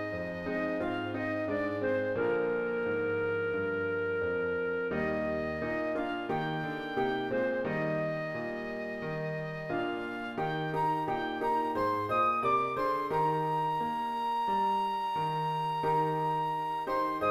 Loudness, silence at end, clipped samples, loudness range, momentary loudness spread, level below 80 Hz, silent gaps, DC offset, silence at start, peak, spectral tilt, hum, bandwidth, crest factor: -32 LUFS; 0 s; under 0.1%; 4 LU; 6 LU; -60 dBFS; none; under 0.1%; 0 s; -18 dBFS; -7 dB/octave; none; 15 kHz; 14 dB